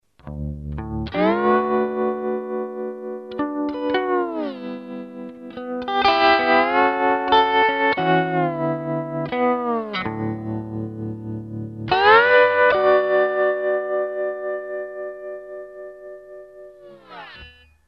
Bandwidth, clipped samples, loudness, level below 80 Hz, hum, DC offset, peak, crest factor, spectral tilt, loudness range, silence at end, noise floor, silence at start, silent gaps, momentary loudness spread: 6.4 kHz; under 0.1%; -20 LUFS; -46 dBFS; none; under 0.1%; -4 dBFS; 18 dB; -7.5 dB/octave; 9 LU; 0.35 s; -46 dBFS; 0.25 s; none; 20 LU